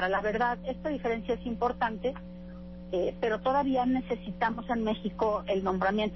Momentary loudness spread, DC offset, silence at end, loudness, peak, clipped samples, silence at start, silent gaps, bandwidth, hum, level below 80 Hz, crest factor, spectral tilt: 8 LU; under 0.1%; 0 s; -30 LUFS; -16 dBFS; under 0.1%; 0 s; none; 6 kHz; 60 Hz at -45 dBFS; -50 dBFS; 14 dB; -7.5 dB/octave